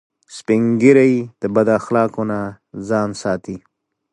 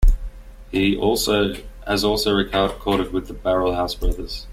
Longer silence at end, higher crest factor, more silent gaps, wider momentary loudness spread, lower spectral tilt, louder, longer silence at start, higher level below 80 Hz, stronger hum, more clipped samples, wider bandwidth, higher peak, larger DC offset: first, 0.55 s vs 0 s; about the same, 16 dB vs 16 dB; neither; first, 20 LU vs 8 LU; first, -7 dB/octave vs -4.5 dB/octave; first, -17 LUFS vs -21 LUFS; first, 0.3 s vs 0 s; second, -56 dBFS vs -26 dBFS; neither; neither; second, 11 kHz vs 15.5 kHz; first, 0 dBFS vs -4 dBFS; neither